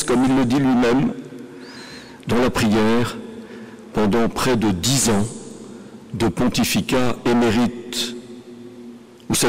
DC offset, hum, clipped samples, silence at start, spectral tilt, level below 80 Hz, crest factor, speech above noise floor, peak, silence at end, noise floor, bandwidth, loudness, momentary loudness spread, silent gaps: 0.7%; none; under 0.1%; 0 s; -4.5 dB/octave; -44 dBFS; 8 dB; 22 dB; -12 dBFS; 0 s; -40 dBFS; 16 kHz; -19 LUFS; 21 LU; none